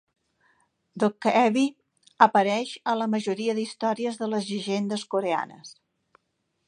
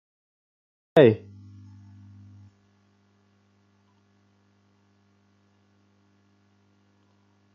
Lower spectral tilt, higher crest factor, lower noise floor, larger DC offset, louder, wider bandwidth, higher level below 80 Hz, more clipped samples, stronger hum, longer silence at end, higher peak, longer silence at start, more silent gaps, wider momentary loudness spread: about the same, -5 dB/octave vs -6 dB/octave; about the same, 24 dB vs 26 dB; first, -76 dBFS vs -64 dBFS; neither; second, -25 LUFS vs -20 LUFS; first, 10 kHz vs 6.6 kHz; about the same, -78 dBFS vs -76 dBFS; neither; neither; second, 0.95 s vs 6.4 s; about the same, -2 dBFS vs -4 dBFS; about the same, 0.95 s vs 0.95 s; neither; second, 9 LU vs 32 LU